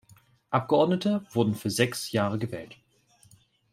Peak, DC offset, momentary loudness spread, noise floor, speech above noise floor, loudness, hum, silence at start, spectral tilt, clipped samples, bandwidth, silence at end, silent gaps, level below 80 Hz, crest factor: -8 dBFS; under 0.1%; 11 LU; -61 dBFS; 35 dB; -27 LUFS; none; 0.5 s; -5.5 dB/octave; under 0.1%; 16 kHz; 1 s; none; -66 dBFS; 20 dB